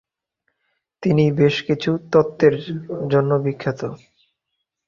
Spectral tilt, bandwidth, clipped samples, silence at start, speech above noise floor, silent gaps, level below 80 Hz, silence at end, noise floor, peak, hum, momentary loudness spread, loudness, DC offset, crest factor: -8 dB/octave; 7.2 kHz; under 0.1%; 1 s; 59 dB; none; -56 dBFS; 0.9 s; -78 dBFS; -2 dBFS; none; 11 LU; -19 LUFS; under 0.1%; 18 dB